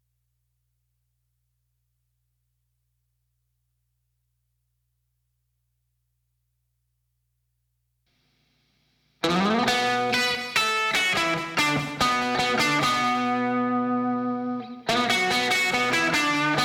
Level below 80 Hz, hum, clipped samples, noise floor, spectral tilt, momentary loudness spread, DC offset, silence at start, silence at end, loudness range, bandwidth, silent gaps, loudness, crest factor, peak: -60 dBFS; none; under 0.1%; -75 dBFS; -3 dB/octave; 5 LU; under 0.1%; 9.25 s; 0 s; 5 LU; 18.5 kHz; none; -23 LUFS; 16 dB; -10 dBFS